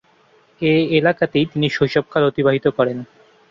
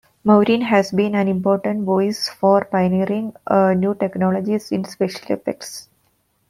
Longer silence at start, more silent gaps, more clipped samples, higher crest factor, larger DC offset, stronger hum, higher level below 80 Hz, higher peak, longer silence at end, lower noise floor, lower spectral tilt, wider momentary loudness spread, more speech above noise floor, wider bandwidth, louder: first, 0.6 s vs 0.25 s; neither; neither; about the same, 16 dB vs 18 dB; neither; neither; first, -54 dBFS vs -60 dBFS; about the same, -2 dBFS vs -2 dBFS; second, 0.45 s vs 0.65 s; second, -55 dBFS vs -64 dBFS; about the same, -7.5 dB/octave vs -6.5 dB/octave; second, 5 LU vs 9 LU; second, 37 dB vs 46 dB; second, 7.4 kHz vs 14.5 kHz; about the same, -18 LUFS vs -19 LUFS